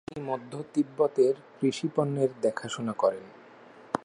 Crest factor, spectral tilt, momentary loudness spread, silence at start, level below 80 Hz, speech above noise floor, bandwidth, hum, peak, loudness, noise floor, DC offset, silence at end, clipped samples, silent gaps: 22 dB; -6 dB/octave; 9 LU; 0.1 s; -72 dBFS; 23 dB; 11 kHz; none; -6 dBFS; -29 LUFS; -52 dBFS; under 0.1%; 0.1 s; under 0.1%; none